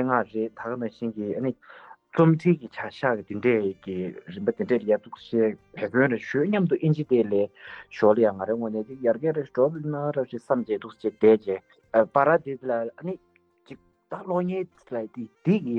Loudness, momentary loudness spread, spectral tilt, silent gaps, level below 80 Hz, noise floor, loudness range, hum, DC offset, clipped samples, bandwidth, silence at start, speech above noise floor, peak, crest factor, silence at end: -25 LUFS; 13 LU; -9 dB/octave; none; -70 dBFS; -49 dBFS; 3 LU; none; under 0.1%; under 0.1%; 6.6 kHz; 0 s; 24 dB; -6 dBFS; 18 dB; 0 s